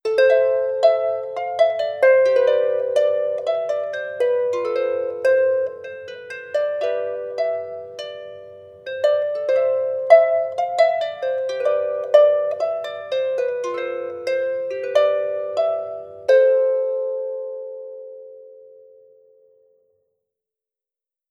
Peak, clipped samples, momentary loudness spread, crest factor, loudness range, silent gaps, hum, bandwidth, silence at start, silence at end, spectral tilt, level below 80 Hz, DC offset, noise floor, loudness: 0 dBFS; under 0.1%; 18 LU; 20 dB; 8 LU; none; none; 8.8 kHz; 0.05 s; 2.6 s; -3.5 dB/octave; -76 dBFS; under 0.1%; -87 dBFS; -20 LUFS